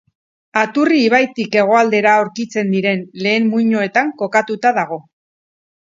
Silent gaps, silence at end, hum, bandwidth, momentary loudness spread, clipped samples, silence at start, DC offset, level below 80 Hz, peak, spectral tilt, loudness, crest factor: none; 0.95 s; none; 7.6 kHz; 8 LU; under 0.1%; 0.55 s; under 0.1%; -66 dBFS; 0 dBFS; -5.5 dB/octave; -15 LUFS; 16 dB